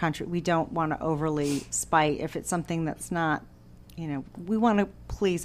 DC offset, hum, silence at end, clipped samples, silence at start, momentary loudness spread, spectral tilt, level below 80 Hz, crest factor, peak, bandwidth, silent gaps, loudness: under 0.1%; none; 0 s; under 0.1%; 0 s; 11 LU; -5 dB/octave; -50 dBFS; 20 dB; -8 dBFS; 15.5 kHz; none; -28 LUFS